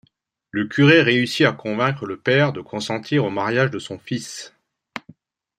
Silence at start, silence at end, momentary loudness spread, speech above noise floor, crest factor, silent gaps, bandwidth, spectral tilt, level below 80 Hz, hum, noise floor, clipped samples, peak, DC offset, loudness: 0.55 s; 0.6 s; 21 LU; 43 dB; 20 dB; none; 13.5 kHz; -5.5 dB/octave; -64 dBFS; none; -63 dBFS; under 0.1%; -2 dBFS; under 0.1%; -19 LUFS